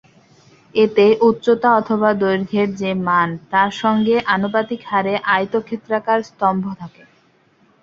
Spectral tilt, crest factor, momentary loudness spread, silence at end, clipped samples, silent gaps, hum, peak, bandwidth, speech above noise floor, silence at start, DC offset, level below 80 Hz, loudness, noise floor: -6.5 dB/octave; 16 dB; 9 LU; 0.95 s; under 0.1%; none; none; -2 dBFS; 7.4 kHz; 39 dB; 0.75 s; under 0.1%; -58 dBFS; -17 LUFS; -56 dBFS